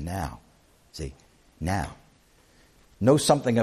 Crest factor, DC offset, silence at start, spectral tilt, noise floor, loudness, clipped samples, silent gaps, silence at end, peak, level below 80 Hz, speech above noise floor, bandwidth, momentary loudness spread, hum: 22 dB; under 0.1%; 0 s; -5.5 dB/octave; -59 dBFS; -25 LUFS; under 0.1%; none; 0 s; -6 dBFS; -44 dBFS; 35 dB; 14.5 kHz; 18 LU; none